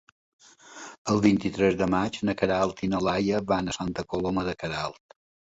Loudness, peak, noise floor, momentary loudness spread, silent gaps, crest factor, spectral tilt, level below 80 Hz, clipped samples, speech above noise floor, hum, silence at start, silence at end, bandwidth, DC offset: -26 LUFS; -8 dBFS; -46 dBFS; 9 LU; 0.98-1.05 s; 20 dB; -6 dB/octave; -52 dBFS; under 0.1%; 20 dB; none; 0.7 s; 0.65 s; 8 kHz; under 0.1%